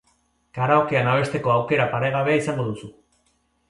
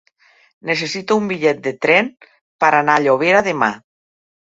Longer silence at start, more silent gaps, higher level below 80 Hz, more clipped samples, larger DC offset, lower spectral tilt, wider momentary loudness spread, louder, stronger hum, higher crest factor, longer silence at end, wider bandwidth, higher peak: about the same, 0.55 s vs 0.65 s; second, none vs 2.41-2.59 s; about the same, -58 dBFS vs -62 dBFS; neither; neither; first, -6.5 dB/octave vs -4.5 dB/octave; about the same, 10 LU vs 8 LU; second, -21 LUFS vs -16 LUFS; neither; about the same, 18 dB vs 18 dB; about the same, 0.8 s vs 0.75 s; first, 11.5 kHz vs 8 kHz; second, -4 dBFS vs 0 dBFS